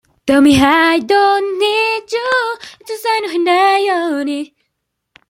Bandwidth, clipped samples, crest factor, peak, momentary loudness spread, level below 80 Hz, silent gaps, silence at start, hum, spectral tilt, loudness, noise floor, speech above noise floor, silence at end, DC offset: 16.5 kHz; under 0.1%; 14 dB; 0 dBFS; 12 LU; -46 dBFS; none; 0.25 s; none; -4 dB/octave; -13 LUFS; -73 dBFS; 59 dB; 0.85 s; under 0.1%